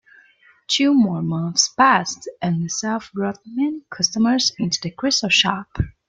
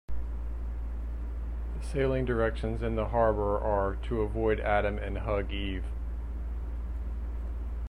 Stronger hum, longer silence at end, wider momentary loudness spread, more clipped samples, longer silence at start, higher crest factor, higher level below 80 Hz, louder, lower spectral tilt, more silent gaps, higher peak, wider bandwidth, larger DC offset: neither; first, 0.2 s vs 0 s; about the same, 10 LU vs 11 LU; neither; first, 0.7 s vs 0.1 s; about the same, 18 dB vs 18 dB; second, -44 dBFS vs -34 dBFS; first, -19 LUFS vs -32 LUFS; second, -3.5 dB/octave vs -8 dB/octave; neither; first, -2 dBFS vs -12 dBFS; about the same, 9.4 kHz vs 10 kHz; neither